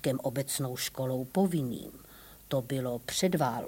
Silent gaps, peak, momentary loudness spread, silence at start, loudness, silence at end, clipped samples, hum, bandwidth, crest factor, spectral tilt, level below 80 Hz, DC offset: none; -16 dBFS; 17 LU; 0 s; -32 LUFS; 0 s; under 0.1%; none; 17 kHz; 16 dB; -5 dB/octave; -62 dBFS; under 0.1%